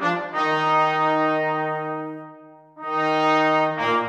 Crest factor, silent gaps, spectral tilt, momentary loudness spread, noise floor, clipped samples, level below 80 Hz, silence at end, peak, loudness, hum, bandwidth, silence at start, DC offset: 14 dB; none; -5.5 dB/octave; 12 LU; -46 dBFS; under 0.1%; -74 dBFS; 0 s; -8 dBFS; -21 LUFS; none; 9.6 kHz; 0 s; under 0.1%